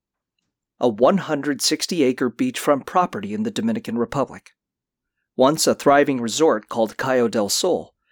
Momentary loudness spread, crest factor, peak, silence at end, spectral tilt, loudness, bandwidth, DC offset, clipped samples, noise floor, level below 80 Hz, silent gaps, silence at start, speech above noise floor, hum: 8 LU; 16 dB; -4 dBFS; 0.25 s; -4 dB/octave; -20 LUFS; 20 kHz; under 0.1%; under 0.1%; -85 dBFS; -60 dBFS; none; 0.8 s; 65 dB; none